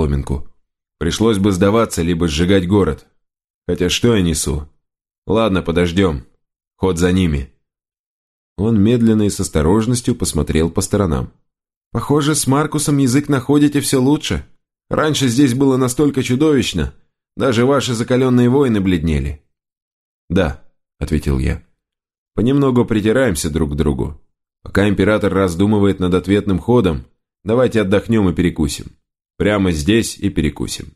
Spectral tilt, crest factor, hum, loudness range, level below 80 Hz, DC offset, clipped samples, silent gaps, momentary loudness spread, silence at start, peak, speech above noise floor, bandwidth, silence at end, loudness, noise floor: -5.5 dB/octave; 16 dB; none; 3 LU; -32 dBFS; under 0.1%; under 0.1%; 3.50-3.62 s, 5.18-5.22 s, 7.99-8.56 s, 11.76-11.91 s, 19.82-20.28 s, 22.18-22.26 s; 10 LU; 0 s; 0 dBFS; 55 dB; 13 kHz; 0.1 s; -16 LUFS; -70 dBFS